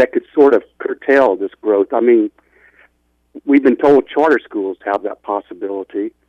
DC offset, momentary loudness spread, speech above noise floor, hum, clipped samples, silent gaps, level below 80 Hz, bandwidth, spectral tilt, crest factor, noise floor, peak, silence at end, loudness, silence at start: under 0.1%; 11 LU; 45 dB; 60 Hz at -65 dBFS; under 0.1%; none; -60 dBFS; 6.6 kHz; -7 dB/octave; 14 dB; -60 dBFS; -2 dBFS; 0.2 s; -15 LUFS; 0 s